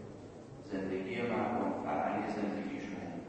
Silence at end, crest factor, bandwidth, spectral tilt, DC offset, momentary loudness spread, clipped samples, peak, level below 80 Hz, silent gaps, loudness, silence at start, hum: 0 s; 16 dB; 8.4 kHz; -7 dB/octave; under 0.1%; 15 LU; under 0.1%; -22 dBFS; -66 dBFS; none; -37 LUFS; 0 s; none